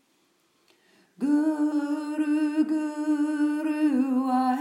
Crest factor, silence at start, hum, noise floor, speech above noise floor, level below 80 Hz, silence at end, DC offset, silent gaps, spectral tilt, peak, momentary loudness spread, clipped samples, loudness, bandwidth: 12 dB; 1.2 s; none; -67 dBFS; 43 dB; under -90 dBFS; 0 s; under 0.1%; none; -5 dB/octave; -14 dBFS; 4 LU; under 0.1%; -26 LUFS; 11.5 kHz